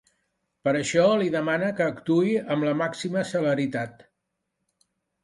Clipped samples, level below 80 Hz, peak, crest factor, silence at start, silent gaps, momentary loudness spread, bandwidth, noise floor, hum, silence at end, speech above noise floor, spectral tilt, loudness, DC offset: under 0.1%; -66 dBFS; -8 dBFS; 18 dB; 0.65 s; none; 8 LU; 11.5 kHz; -80 dBFS; none; 1.35 s; 56 dB; -5.5 dB/octave; -25 LUFS; under 0.1%